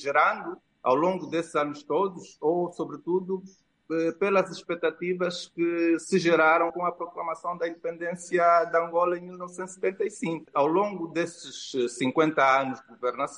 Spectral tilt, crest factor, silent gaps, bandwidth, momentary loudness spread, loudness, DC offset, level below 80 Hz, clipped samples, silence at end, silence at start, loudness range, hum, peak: -5 dB/octave; 18 dB; none; 11 kHz; 12 LU; -27 LUFS; under 0.1%; -76 dBFS; under 0.1%; 0 s; 0 s; 4 LU; none; -8 dBFS